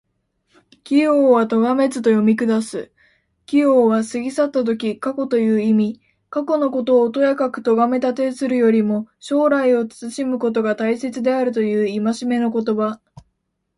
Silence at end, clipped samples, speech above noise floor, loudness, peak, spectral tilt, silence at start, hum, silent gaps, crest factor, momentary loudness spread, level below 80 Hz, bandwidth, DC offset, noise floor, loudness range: 0.8 s; under 0.1%; 54 dB; -18 LUFS; -4 dBFS; -6.5 dB/octave; 0.85 s; none; none; 14 dB; 8 LU; -64 dBFS; 11.5 kHz; under 0.1%; -72 dBFS; 2 LU